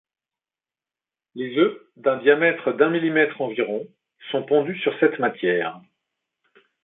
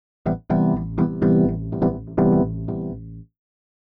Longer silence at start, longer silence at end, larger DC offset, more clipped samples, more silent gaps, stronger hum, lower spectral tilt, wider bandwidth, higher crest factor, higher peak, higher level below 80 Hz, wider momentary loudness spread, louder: first, 1.35 s vs 0.25 s; first, 1.05 s vs 0.6 s; neither; neither; neither; neither; second, -10 dB/octave vs -13 dB/octave; first, 4 kHz vs 2.7 kHz; first, 20 dB vs 12 dB; first, -4 dBFS vs -8 dBFS; second, -74 dBFS vs -40 dBFS; about the same, 11 LU vs 11 LU; about the same, -22 LUFS vs -21 LUFS